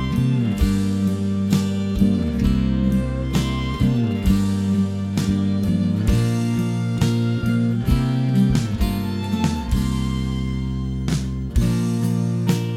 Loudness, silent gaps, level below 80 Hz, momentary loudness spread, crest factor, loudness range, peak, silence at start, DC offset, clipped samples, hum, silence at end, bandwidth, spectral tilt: -21 LUFS; none; -28 dBFS; 4 LU; 16 dB; 2 LU; -4 dBFS; 0 s; under 0.1%; under 0.1%; none; 0 s; 15.5 kHz; -7 dB/octave